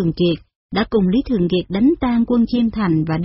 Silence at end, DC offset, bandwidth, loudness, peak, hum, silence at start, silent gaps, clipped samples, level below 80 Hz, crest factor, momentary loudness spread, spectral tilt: 0 s; under 0.1%; 5.8 kHz; -18 LUFS; -6 dBFS; none; 0 s; 0.55-0.69 s; under 0.1%; -38 dBFS; 12 dB; 4 LU; -6.5 dB/octave